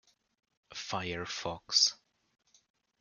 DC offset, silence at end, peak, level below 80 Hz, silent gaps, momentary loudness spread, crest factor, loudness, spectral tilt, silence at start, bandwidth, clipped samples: under 0.1%; 1.05 s; -12 dBFS; -70 dBFS; none; 15 LU; 24 dB; -31 LUFS; -1 dB/octave; 0.7 s; 12 kHz; under 0.1%